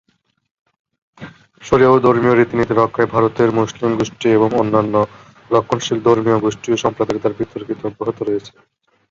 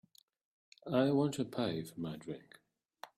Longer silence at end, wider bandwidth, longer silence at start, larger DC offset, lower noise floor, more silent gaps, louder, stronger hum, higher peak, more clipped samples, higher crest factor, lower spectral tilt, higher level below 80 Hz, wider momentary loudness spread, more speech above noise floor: first, 0.6 s vs 0.1 s; second, 7.6 kHz vs 15 kHz; first, 1.2 s vs 0.85 s; neither; second, -38 dBFS vs -57 dBFS; neither; first, -16 LUFS vs -36 LUFS; neither; first, 0 dBFS vs -18 dBFS; neither; about the same, 16 dB vs 20 dB; about the same, -6.5 dB/octave vs -6.5 dB/octave; first, -48 dBFS vs -74 dBFS; second, 10 LU vs 18 LU; about the same, 23 dB vs 22 dB